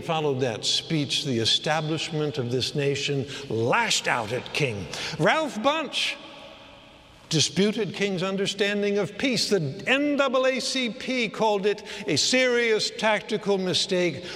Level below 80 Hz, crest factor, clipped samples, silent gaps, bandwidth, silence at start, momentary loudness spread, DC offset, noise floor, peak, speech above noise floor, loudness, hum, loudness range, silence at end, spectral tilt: -62 dBFS; 20 dB; under 0.1%; none; 14.5 kHz; 0 s; 6 LU; under 0.1%; -50 dBFS; -6 dBFS; 25 dB; -24 LUFS; none; 3 LU; 0 s; -3.5 dB/octave